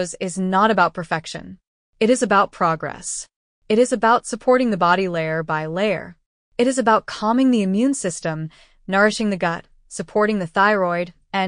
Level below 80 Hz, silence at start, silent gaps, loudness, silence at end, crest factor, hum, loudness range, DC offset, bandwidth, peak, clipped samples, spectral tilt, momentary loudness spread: -54 dBFS; 0 s; 1.67-1.93 s, 3.36-3.62 s, 6.26-6.52 s; -19 LUFS; 0 s; 16 dB; none; 2 LU; under 0.1%; 10 kHz; -4 dBFS; under 0.1%; -5 dB/octave; 11 LU